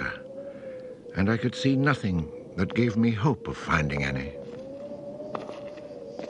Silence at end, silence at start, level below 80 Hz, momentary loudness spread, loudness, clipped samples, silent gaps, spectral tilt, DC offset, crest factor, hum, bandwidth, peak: 0 s; 0 s; -50 dBFS; 16 LU; -27 LUFS; under 0.1%; none; -7 dB/octave; under 0.1%; 22 dB; none; 10 kHz; -6 dBFS